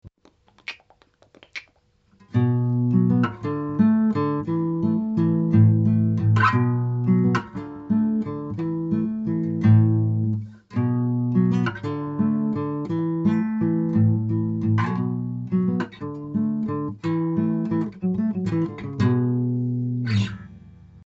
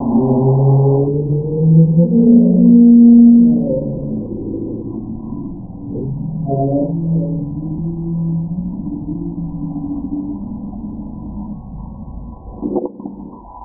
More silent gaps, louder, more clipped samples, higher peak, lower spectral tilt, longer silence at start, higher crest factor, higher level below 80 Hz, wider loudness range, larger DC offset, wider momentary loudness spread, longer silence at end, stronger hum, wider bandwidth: neither; second, -23 LUFS vs -14 LUFS; neither; second, -6 dBFS vs 0 dBFS; second, -9.5 dB/octave vs -20.5 dB/octave; about the same, 0.05 s vs 0 s; about the same, 16 dB vs 14 dB; second, -58 dBFS vs -36 dBFS; second, 5 LU vs 16 LU; neither; second, 10 LU vs 21 LU; first, 0.15 s vs 0 s; neither; first, 7 kHz vs 1.2 kHz